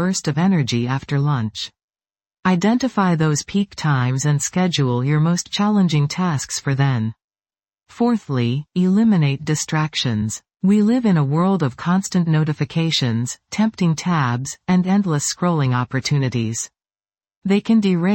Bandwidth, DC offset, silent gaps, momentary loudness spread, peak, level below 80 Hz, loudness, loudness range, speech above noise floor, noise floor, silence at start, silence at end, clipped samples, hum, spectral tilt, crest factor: 17 kHz; under 0.1%; 1.83-1.88 s, 7.24-7.28 s, 17.37-17.42 s; 6 LU; -4 dBFS; -54 dBFS; -19 LUFS; 2 LU; over 72 dB; under -90 dBFS; 0 s; 0 s; under 0.1%; none; -5.5 dB/octave; 14 dB